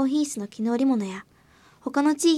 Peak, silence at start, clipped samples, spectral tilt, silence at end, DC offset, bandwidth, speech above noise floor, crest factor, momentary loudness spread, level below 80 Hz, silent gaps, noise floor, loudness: -10 dBFS; 0 s; under 0.1%; -4 dB/octave; 0 s; under 0.1%; 13.5 kHz; 33 dB; 16 dB; 13 LU; -68 dBFS; none; -56 dBFS; -25 LUFS